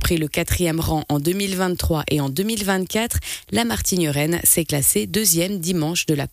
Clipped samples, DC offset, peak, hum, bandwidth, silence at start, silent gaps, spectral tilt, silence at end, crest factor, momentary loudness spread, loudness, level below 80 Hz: under 0.1%; under 0.1%; -4 dBFS; none; 15.5 kHz; 0 s; none; -4 dB/octave; 0.05 s; 16 dB; 6 LU; -20 LUFS; -36 dBFS